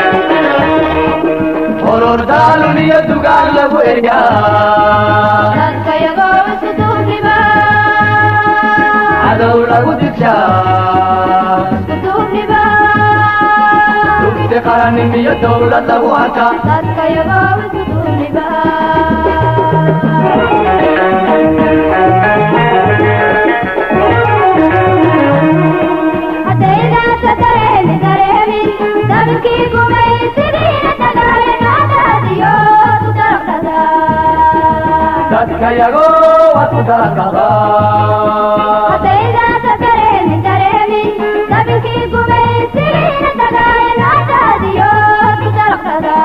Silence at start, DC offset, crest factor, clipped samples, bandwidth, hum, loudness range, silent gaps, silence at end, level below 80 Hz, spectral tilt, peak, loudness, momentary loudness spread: 0 s; under 0.1%; 10 dB; 0.1%; 13.5 kHz; none; 2 LU; none; 0 s; -32 dBFS; -8 dB/octave; 0 dBFS; -9 LUFS; 5 LU